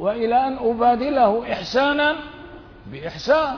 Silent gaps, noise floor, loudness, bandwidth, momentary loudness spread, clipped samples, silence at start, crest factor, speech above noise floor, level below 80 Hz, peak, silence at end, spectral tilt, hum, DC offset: none; -40 dBFS; -20 LUFS; 5.4 kHz; 16 LU; under 0.1%; 0 s; 14 dB; 21 dB; -48 dBFS; -6 dBFS; 0 s; -5 dB/octave; none; under 0.1%